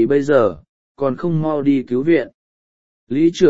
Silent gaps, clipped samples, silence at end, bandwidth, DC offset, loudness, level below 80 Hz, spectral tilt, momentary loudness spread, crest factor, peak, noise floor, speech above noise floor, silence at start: 0.69-0.95 s, 2.34-3.07 s; under 0.1%; 0 s; 7.8 kHz; under 0.1%; -18 LUFS; -54 dBFS; -7.5 dB/octave; 10 LU; 16 dB; 0 dBFS; under -90 dBFS; over 74 dB; 0 s